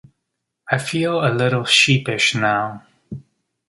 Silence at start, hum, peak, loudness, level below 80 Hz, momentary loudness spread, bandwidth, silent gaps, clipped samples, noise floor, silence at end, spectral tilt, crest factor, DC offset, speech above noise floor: 0.65 s; none; -2 dBFS; -17 LUFS; -58 dBFS; 24 LU; 11.5 kHz; none; under 0.1%; -77 dBFS; 0.5 s; -4 dB/octave; 20 dB; under 0.1%; 59 dB